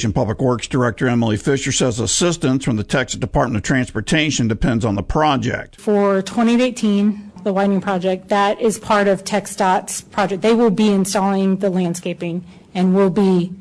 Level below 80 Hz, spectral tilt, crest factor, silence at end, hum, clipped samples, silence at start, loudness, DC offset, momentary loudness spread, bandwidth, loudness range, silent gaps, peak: -38 dBFS; -5 dB/octave; 16 dB; 0 s; none; under 0.1%; 0 s; -18 LUFS; under 0.1%; 6 LU; 11 kHz; 1 LU; none; -2 dBFS